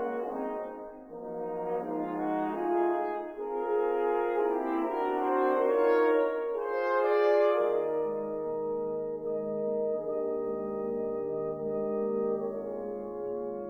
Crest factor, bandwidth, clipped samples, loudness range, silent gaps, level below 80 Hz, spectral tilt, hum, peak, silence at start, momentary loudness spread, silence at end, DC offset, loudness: 16 dB; 5.6 kHz; under 0.1%; 6 LU; none; -66 dBFS; -8 dB/octave; none; -14 dBFS; 0 s; 11 LU; 0 s; under 0.1%; -30 LUFS